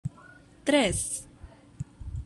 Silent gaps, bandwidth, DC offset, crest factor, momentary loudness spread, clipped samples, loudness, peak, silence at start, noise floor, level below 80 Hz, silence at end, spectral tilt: none; 13 kHz; under 0.1%; 22 dB; 19 LU; under 0.1%; -27 LUFS; -10 dBFS; 0.05 s; -53 dBFS; -46 dBFS; 0 s; -3.5 dB/octave